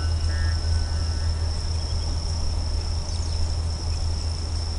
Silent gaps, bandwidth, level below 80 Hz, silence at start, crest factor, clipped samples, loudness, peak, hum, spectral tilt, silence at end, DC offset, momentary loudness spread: none; 11 kHz; -28 dBFS; 0 s; 12 dB; under 0.1%; -27 LUFS; -12 dBFS; none; -4.5 dB/octave; 0 s; 0.4%; 3 LU